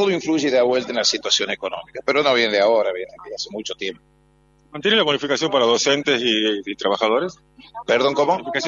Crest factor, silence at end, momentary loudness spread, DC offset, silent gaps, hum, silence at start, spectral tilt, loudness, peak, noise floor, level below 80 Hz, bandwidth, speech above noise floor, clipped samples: 16 dB; 0 s; 13 LU; under 0.1%; none; none; 0 s; -2.5 dB/octave; -19 LUFS; -4 dBFS; -57 dBFS; -62 dBFS; 7.8 kHz; 37 dB; under 0.1%